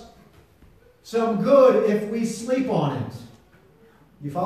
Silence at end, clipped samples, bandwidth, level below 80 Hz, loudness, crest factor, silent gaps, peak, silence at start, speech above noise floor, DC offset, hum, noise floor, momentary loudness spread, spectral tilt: 0 s; under 0.1%; 14 kHz; -62 dBFS; -21 LUFS; 18 dB; none; -4 dBFS; 0 s; 34 dB; under 0.1%; none; -54 dBFS; 18 LU; -6.5 dB/octave